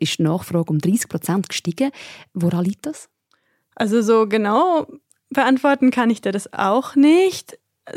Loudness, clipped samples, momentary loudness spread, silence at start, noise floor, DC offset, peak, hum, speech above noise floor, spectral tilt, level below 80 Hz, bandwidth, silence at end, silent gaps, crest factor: -19 LUFS; under 0.1%; 11 LU; 0 s; -65 dBFS; under 0.1%; -4 dBFS; none; 47 dB; -5.5 dB/octave; -64 dBFS; 16 kHz; 0 s; none; 14 dB